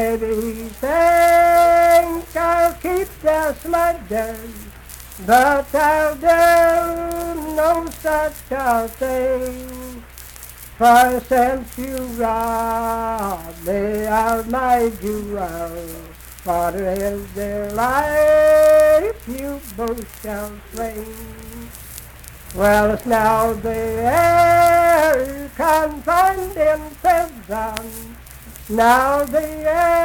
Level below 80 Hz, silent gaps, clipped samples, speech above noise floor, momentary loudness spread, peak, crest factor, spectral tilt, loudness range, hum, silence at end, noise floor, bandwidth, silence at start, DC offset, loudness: -38 dBFS; none; under 0.1%; 21 dB; 21 LU; -2 dBFS; 16 dB; -4.5 dB/octave; 6 LU; none; 0 s; -38 dBFS; 19 kHz; 0 s; under 0.1%; -17 LUFS